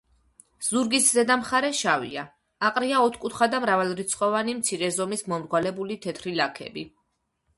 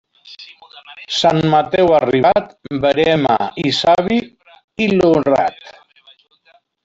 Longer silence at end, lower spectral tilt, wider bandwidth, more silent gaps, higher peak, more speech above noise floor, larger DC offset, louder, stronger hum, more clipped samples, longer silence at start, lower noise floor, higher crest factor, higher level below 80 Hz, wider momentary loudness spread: second, 0.7 s vs 1.15 s; second, -2.5 dB/octave vs -5.5 dB/octave; first, 12 kHz vs 8 kHz; second, none vs 4.64-4.68 s; second, -6 dBFS vs -2 dBFS; first, 50 dB vs 40 dB; neither; second, -24 LUFS vs -15 LUFS; neither; neither; first, 0.6 s vs 0.25 s; first, -74 dBFS vs -55 dBFS; about the same, 20 dB vs 16 dB; second, -64 dBFS vs -50 dBFS; about the same, 13 LU vs 15 LU